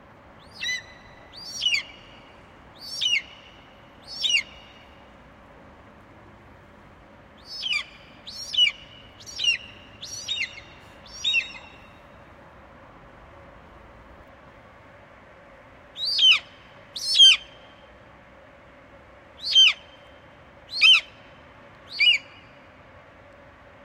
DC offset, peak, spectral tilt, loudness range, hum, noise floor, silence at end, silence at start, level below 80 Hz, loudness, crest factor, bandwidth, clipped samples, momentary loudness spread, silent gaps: under 0.1%; -6 dBFS; 1 dB/octave; 12 LU; none; -50 dBFS; 1.65 s; 0.55 s; -58 dBFS; -20 LUFS; 22 dB; 16 kHz; under 0.1%; 27 LU; none